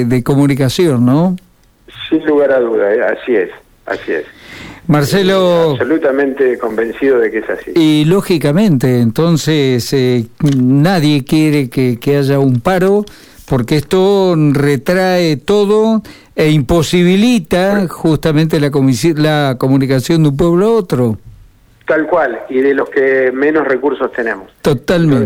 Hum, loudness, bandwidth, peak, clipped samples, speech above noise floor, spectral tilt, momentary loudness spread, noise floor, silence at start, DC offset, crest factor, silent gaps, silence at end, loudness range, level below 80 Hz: none; -12 LUFS; 18 kHz; -2 dBFS; under 0.1%; 32 dB; -6.5 dB/octave; 7 LU; -44 dBFS; 0 s; under 0.1%; 10 dB; none; 0 s; 2 LU; -40 dBFS